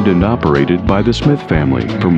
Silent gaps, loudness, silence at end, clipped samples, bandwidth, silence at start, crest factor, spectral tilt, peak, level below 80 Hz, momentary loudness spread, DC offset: none; -13 LUFS; 0 s; under 0.1%; 8.4 kHz; 0 s; 12 dB; -8 dB/octave; 0 dBFS; -28 dBFS; 2 LU; under 0.1%